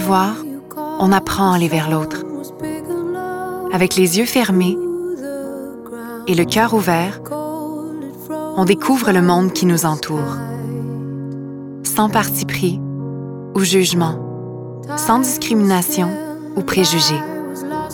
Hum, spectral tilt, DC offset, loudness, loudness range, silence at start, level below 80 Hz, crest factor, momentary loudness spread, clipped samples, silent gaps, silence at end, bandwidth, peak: none; -4.5 dB/octave; under 0.1%; -18 LUFS; 3 LU; 0 s; -52 dBFS; 16 dB; 14 LU; under 0.1%; none; 0 s; 19.5 kHz; 0 dBFS